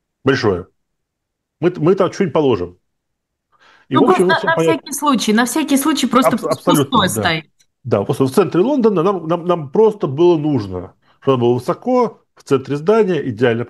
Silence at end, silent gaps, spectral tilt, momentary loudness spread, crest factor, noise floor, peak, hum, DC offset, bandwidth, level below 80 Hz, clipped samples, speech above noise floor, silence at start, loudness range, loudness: 0 s; none; -5.5 dB/octave; 7 LU; 16 dB; -76 dBFS; 0 dBFS; none; under 0.1%; 13 kHz; -56 dBFS; under 0.1%; 61 dB; 0.25 s; 4 LU; -16 LUFS